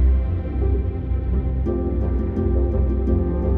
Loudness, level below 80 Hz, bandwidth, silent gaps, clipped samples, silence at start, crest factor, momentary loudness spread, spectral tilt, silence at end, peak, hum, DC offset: -22 LUFS; -22 dBFS; 2.5 kHz; none; under 0.1%; 0 s; 10 dB; 3 LU; -12 dB/octave; 0 s; -8 dBFS; none; under 0.1%